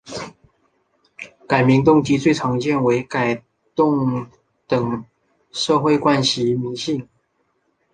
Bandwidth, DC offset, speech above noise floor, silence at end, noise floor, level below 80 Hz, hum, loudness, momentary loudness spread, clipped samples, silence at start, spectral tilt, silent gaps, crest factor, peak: 9.6 kHz; under 0.1%; 50 dB; 0.9 s; -67 dBFS; -54 dBFS; none; -19 LUFS; 17 LU; under 0.1%; 0.05 s; -5.5 dB/octave; none; 20 dB; 0 dBFS